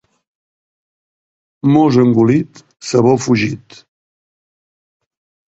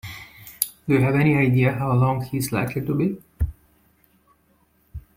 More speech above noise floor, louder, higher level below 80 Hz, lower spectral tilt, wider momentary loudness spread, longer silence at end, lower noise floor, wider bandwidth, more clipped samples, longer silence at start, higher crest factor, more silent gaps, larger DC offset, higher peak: first, over 77 dB vs 42 dB; first, -13 LUFS vs -22 LUFS; second, -52 dBFS vs -42 dBFS; about the same, -6.5 dB/octave vs -6.5 dB/octave; second, 17 LU vs 20 LU; first, 1.9 s vs 0.15 s; first, under -90 dBFS vs -62 dBFS; second, 8.2 kHz vs 16.5 kHz; neither; first, 1.65 s vs 0.05 s; second, 16 dB vs 22 dB; neither; neither; about the same, 0 dBFS vs 0 dBFS